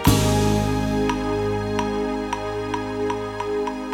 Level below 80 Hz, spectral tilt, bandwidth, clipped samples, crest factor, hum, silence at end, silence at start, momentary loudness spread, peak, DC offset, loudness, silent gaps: -34 dBFS; -5.5 dB/octave; 18.5 kHz; under 0.1%; 20 dB; none; 0 s; 0 s; 7 LU; -4 dBFS; under 0.1%; -23 LUFS; none